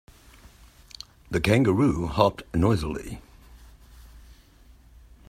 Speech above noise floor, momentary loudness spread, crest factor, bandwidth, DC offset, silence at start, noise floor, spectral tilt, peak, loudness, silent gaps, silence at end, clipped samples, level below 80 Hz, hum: 30 dB; 22 LU; 24 dB; 16 kHz; under 0.1%; 1.3 s; -53 dBFS; -7 dB/octave; -4 dBFS; -24 LUFS; none; 1.1 s; under 0.1%; -44 dBFS; none